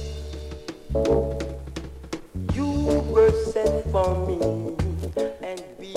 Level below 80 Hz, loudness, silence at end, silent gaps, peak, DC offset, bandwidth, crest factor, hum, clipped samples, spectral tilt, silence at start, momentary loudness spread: -34 dBFS; -24 LUFS; 0 s; none; -8 dBFS; under 0.1%; 13.5 kHz; 18 dB; none; under 0.1%; -7 dB/octave; 0 s; 17 LU